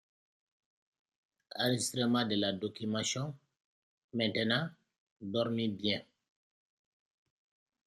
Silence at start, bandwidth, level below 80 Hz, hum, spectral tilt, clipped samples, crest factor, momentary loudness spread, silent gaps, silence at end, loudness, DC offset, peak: 1.55 s; 14 kHz; -76 dBFS; none; -4 dB/octave; under 0.1%; 20 dB; 12 LU; 3.64-4.09 s, 4.98-5.16 s; 1.85 s; -34 LUFS; under 0.1%; -16 dBFS